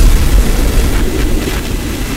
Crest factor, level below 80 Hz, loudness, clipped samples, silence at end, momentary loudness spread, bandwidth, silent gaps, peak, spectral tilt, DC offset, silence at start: 10 dB; -12 dBFS; -15 LUFS; 0.4%; 0 s; 6 LU; 16.5 kHz; none; 0 dBFS; -5 dB/octave; under 0.1%; 0 s